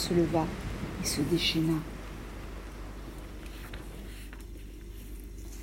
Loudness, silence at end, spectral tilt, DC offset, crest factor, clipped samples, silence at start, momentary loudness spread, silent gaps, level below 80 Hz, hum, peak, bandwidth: -32 LUFS; 0 s; -4.5 dB/octave; under 0.1%; 20 dB; under 0.1%; 0 s; 18 LU; none; -44 dBFS; none; -14 dBFS; 16 kHz